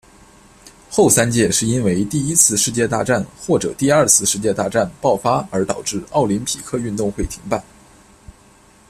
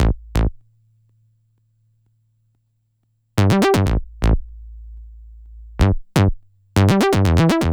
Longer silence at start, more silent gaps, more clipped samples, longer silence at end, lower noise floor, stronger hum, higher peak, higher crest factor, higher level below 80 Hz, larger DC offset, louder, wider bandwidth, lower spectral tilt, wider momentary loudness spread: first, 0.65 s vs 0 s; neither; neither; first, 0.6 s vs 0 s; second, -49 dBFS vs -67 dBFS; neither; about the same, 0 dBFS vs 0 dBFS; about the same, 18 dB vs 20 dB; second, -42 dBFS vs -26 dBFS; neither; about the same, -17 LUFS vs -18 LUFS; second, 15.5 kHz vs over 20 kHz; second, -4 dB/octave vs -6.5 dB/octave; second, 10 LU vs 25 LU